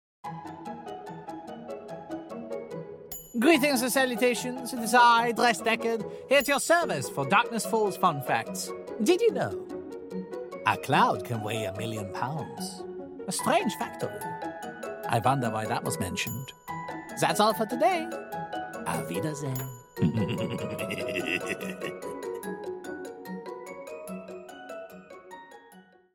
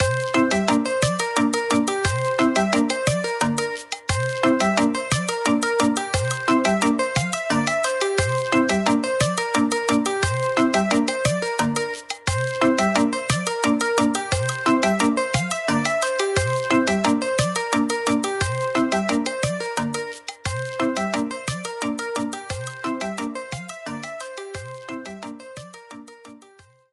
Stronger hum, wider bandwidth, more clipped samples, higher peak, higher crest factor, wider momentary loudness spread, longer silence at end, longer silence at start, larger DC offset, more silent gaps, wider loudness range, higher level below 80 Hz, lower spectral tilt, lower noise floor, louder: neither; first, 17 kHz vs 13.5 kHz; neither; second, -8 dBFS vs -4 dBFS; about the same, 20 dB vs 18 dB; first, 17 LU vs 13 LU; second, 0.35 s vs 0.55 s; first, 0.25 s vs 0 s; neither; neither; first, 12 LU vs 8 LU; second, -66 dBFS vs -48 dBFS; about the same, -4.5 dB/octave vs -4.5 dB/octave; about the same, -55 dBFS vs -52 dBFS; second, -28 LUFS vs -22 LUFS